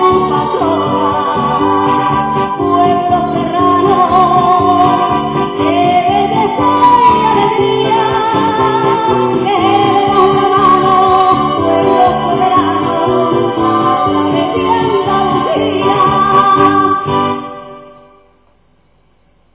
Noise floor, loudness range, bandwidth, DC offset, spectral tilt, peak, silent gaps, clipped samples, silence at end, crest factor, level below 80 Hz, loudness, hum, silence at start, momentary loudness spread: -53 dBFS; 2 LU; 4 kHz; 0.1%; -10 dB/octave; 0 dBFS; none; under 0.1%; 1.65 s; 10 dB; -40 dBFS; -11 LUFS; none; 0 s; 5 LU